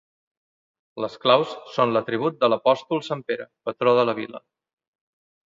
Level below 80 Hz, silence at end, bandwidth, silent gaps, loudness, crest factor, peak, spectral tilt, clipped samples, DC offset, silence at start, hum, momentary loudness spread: -72 dBFS; 1.1 s; 7.6 kHz; none; -23 LUFS; 22 dB; -2 dBFS; -6 dB/octave; under 0.1%; under 0.1%; 0.95 s; none; 13 LU